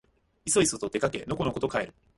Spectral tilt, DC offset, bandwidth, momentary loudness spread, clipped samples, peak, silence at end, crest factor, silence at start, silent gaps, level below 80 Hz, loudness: -3.5 dB/octave; under 0.1%; 11.5 kHz; 7 LU; under 0.1%; -10 dBFS; 0.25 s; 18 dB; 0.45 s; none; -54 dBFS; -28 LUFS